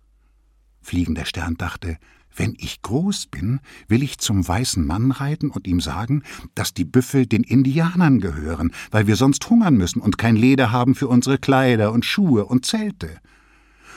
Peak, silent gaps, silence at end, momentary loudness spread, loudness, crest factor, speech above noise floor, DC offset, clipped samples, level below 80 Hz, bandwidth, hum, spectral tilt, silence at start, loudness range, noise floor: -4 dBFS; none; 0 s; 10 LU; -19 LUFS; 16 dB; 38 dB; under 0.1%; under 0.1%; -40 dBFS; 16 kHz; none; -5.5 dB/octave; 0.85 s; 8 LU; -57 dBFS